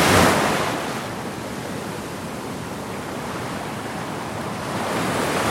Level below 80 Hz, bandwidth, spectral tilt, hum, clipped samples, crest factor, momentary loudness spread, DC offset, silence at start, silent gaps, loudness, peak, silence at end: -48 dBFS; 16.5 kHz; -4 dB/octave; none; under 0.1%; 20 dB; 12 LU; under 0.1%; 0 s; none; -24 LUFS; -2 dBFS; 0 s